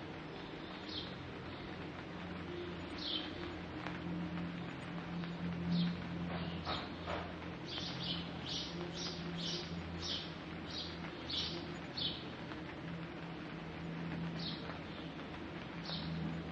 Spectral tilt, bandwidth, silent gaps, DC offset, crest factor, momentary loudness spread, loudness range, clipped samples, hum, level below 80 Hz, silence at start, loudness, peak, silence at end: -5.5 dB/octave; 8 kHz; none; under 0.1%; 18 dB; 7 LU; 3 LU; under 0.1%; none; -62 dBFS; 0 s; -42 LUFS; -24 dBFS; 0 s